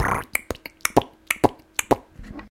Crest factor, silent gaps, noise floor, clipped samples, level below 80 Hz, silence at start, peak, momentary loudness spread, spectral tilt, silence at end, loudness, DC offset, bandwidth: 24 dB; none; -40 dBFS; under 0.1%; -44 dBFS; 0 s; 0 dBFS; 12 LU; -4 dB/octave; 0.1 s; -24 LUFS; under 0.1%; 17 kHz